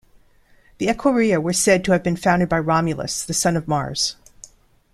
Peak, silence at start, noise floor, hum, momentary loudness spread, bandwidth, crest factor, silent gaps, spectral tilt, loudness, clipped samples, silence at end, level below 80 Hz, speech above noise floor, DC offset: -2 dBFS; 0.8 s; -54 dBFS; none; 7 LU; 14.5 kHz; 18 dB; none; -4.5 dB/octave; -19 LUFS; under 0.1%; 0.8 s; -46 dBFS; 35 dB; under 0.1%